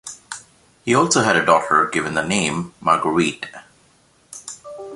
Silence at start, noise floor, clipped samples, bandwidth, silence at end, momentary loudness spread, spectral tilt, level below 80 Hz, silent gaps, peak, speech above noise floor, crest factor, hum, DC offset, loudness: 0.05 s; -56 dBFS; under 0.1%; 11.5 kHz; 0 s; 19 LU; -3.5 dB/octave; -54 dBFS; none; -2 dBFS; 38 dB; 20 dB; none; under 0.1%; -18 LUFS